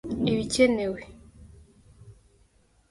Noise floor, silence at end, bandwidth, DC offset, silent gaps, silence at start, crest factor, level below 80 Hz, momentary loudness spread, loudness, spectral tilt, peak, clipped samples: -63 dBFS; 0.8 s; 11.5 kHz; under 0.1%; none; 0.05 s; 22 dB; -52 dBFS; 17 LU; -25 LUFS; -5 dB/octave; -8 dBFS; under 0.1%